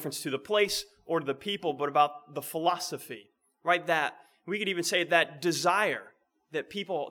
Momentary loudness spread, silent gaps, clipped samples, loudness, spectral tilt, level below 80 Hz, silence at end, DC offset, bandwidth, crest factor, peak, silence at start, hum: 12 LU; none; under 0.1%; -29 LUFS; -3 dB/octave; -72 dBFS; 0 s; under 0.1%; over 20 kHz; 22 dB; -8 dBFS; 0 s; none